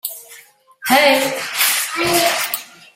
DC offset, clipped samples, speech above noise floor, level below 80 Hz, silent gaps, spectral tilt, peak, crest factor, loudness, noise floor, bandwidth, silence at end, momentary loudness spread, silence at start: under 0.1%; under 0.1%; 30 dB; -58 dBFS; none; -1 dB/octave; 0 dBFS; 18 dB; -15 LUFS; -45 dBFS; 16.5 kHz; 0.3 s; 15 LU; 0.05 s